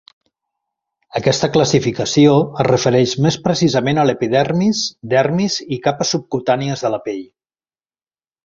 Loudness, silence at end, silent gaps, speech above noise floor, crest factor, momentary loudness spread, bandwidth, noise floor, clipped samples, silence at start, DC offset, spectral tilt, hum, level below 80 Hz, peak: -16 LUFS; 1.2 s; none; over 74 dB; 16 dB; 7 LU; 7.8 kHz; under -90 dBFS; under 0.1%; 1.15 s; under 0.1%; -5 dB/octave; none; -52 dBFS; -2 dBFS